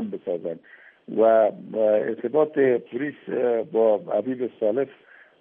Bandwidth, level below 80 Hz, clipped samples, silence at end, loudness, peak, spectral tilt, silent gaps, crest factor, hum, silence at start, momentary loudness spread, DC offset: 3.7 kHz; -82 dBFS; under 0.1%; 0.5 s; -23 LUFS; -8 dBFS; -6 dB/octave; none; 16 dB; none; 0 s; 11 LU; under 0.1%